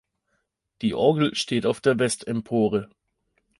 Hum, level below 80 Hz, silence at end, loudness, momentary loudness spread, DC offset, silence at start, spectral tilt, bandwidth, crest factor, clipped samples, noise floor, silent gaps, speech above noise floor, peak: none; -60 dBFS; 0.75 s; -24 LUFS; 7 LU; under 0.1%; 0.8 s; -5 dB/octave; 11.5 kHz; 20 dB; under 0.1%; -75 dBFS; none; 52 dB; -6 dBFS